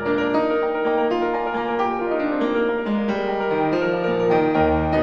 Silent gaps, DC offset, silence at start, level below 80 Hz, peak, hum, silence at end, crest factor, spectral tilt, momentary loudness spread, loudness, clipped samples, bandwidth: none; under 0.1%; 0 s; -42 dBFS; -6 dBFS; none; 0 s; 14 dB; -8 dB/octave; 4 LU; -21 LUFS; under 0.1%; 6.8 kHz